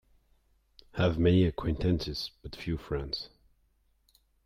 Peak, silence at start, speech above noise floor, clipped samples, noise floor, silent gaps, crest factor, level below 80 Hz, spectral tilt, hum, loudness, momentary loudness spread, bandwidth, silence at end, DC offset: -14 dBFS; 0.95 s; 41 dB; under 0.1%; -70 dBFS; none; 18 dB; -46 dBFS; -7.5 dB/octave; none; -30 LUFS; 15 LU; 13 kHz; 1.2 s; under 0.1%